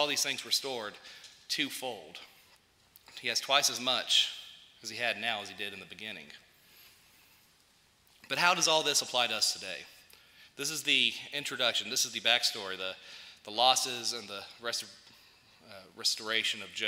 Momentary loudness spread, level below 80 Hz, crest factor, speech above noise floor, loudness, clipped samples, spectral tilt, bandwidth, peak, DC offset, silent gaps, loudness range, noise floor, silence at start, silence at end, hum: 20 LU; -80 dBFS; 24 dB; 34 dB; -30 LUFS; under 0.1%; 0 dB/octave; 16 kHz; -8 dBFS; under 0.1%; none; 7 LU; -66 dBFS; 0 s; 0 s; none